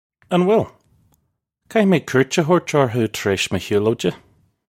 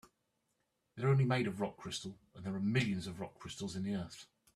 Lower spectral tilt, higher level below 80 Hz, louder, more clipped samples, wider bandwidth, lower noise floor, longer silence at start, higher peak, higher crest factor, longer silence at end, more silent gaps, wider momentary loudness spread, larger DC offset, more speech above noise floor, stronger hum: about the same, -5.5 dB/octave vs -6 dB/octave; first, -56 dBFS vs -68 dBFS; first, -19 LUFS vs -37 LUFS; neither; first, 16.5 kHz vs 12.5 kHz; second, -70 dBFS vs -82 dBFS; second, 0.3 s vs 0.95 s; first, 0 dBFS vs -18 dBFS; about the same, 18 dB vs 20 dB; first, 0.6 s vs 0.3 s; neither; second, 6 LU vs 16 LU; neither; first, 53 dB vs 46 dB; neither